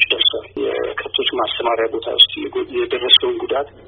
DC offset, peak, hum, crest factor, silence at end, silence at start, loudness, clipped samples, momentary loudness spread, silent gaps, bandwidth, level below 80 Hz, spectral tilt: under 0.1%; 0 dBFS; none; 18 dB; 0.05 s; 0 s; -16 LUFS; under 0.1%; 11 LU; none; 5.4 kHz; -54 dBFS; 1 dB/octave